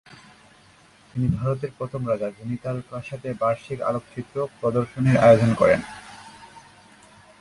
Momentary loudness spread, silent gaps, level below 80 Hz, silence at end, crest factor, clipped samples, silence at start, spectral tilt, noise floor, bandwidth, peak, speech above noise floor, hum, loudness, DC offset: 19 LU; none; -52 dBFS; 0.8 s; 22 dB; under 0.1%; 1.15 s; -7.5 dB/octave; -54 dBFS; 11.5 kHz; -2 dBFS; 31 dB; none; -23 LUFS; under 0.1%